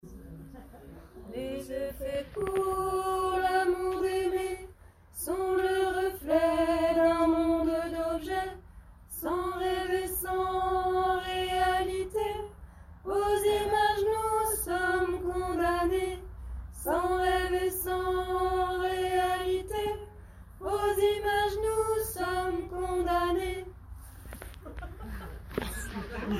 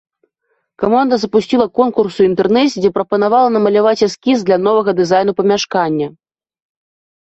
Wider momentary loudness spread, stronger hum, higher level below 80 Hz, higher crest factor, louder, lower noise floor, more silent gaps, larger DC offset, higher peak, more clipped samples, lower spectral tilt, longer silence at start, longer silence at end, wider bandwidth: first, 17 LU vs 4 LU; neither; first, -46 dBFS vs -54 dBFS; about the same, 16 dB vs 12 dB; second, -30 LUFS vs -14 LUFS; second, -53 dBFS vs -67 dBFS; neither; neither; second, -14 dBFS vs -2 dBFS; neither; about the same, -4.5 dB/octave vs -5.5 dB/octave; second, 0.05 s vs 0.8 s; second, 0 s vs 1.15 s; first, 16 kHz vs 8 kHz